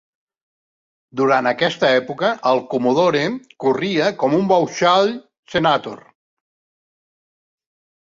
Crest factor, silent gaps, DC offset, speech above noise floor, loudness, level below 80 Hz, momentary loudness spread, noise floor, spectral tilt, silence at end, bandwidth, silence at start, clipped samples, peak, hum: 18 dB; 5.39-5.43 s; under 0.1%; over 73 dB; -18 LUFS; -62 dBFS; 7 LU; under -90 dBFS; -5 dB/octave; 2.2 s; 7.6 kHz; 1.15 s; under 0.1%; -2 dBFS; none